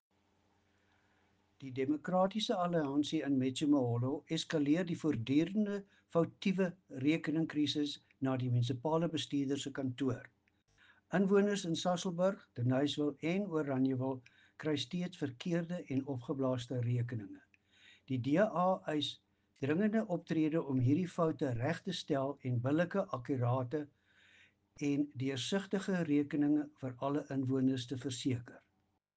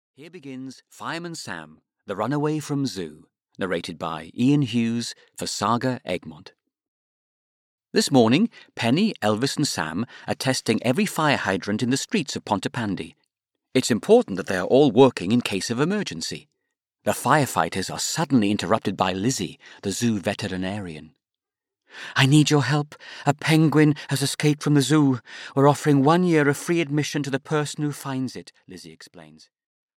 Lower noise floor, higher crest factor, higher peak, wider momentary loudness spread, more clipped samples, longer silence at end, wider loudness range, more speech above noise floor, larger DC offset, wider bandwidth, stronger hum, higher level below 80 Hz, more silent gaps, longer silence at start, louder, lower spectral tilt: second, -79 dBFS vs -89 dBFS; about the same, 18 dB vs 20 dB; second, -18 dBFS vs -4 dBFS; second, 8 LU vs 15 LU; neither; second, 0.6 s vs 0.75 s; second, 3 LU vs 7 LU; second, 45 dB vs 66 dB; neither; second, 9.4 kHz vs 16.5 kHz; neither; second, -72 dBFS vs -64 dBFS; second, none vs 6.88-7.78 s; first, 1.6 s vs 0.2 s; second, -35 LUFS vs -22 LUFS; first, -6.5 dB/octave vs -5 dB/octave